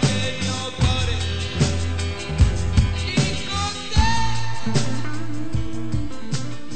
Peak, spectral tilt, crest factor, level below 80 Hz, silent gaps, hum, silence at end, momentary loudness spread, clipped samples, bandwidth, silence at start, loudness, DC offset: -4 dBFS; -5 dB/octave; 16 dB; -30 dBFS; none; none; 0 s; 8 LU; under 0.1%; 9.2 kHz; 0 s; -23 LUFS; under 0.1%